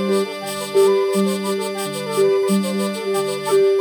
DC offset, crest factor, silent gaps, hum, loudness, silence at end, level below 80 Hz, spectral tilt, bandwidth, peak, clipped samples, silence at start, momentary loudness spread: under 0.1%; 14 dB; none; none; -19 LUFS; 0 s; -68 dBFS; -5 dB/octave; 19.5 kHz; -6 dBFS; under 0.1%; 0 s; 7 LU